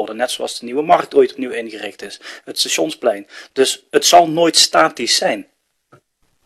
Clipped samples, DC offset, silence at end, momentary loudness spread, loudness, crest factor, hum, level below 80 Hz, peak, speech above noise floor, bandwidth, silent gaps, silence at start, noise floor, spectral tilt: under 0.1%; under 0.1%; 1.05 s; 17 LU; -15 LUFS; 18 dB; none; -62 dBFS; 0 dBFS; 41 dB; 14.5 kHz; none; 0 s; -57 dBFS; -1.5 dB/octave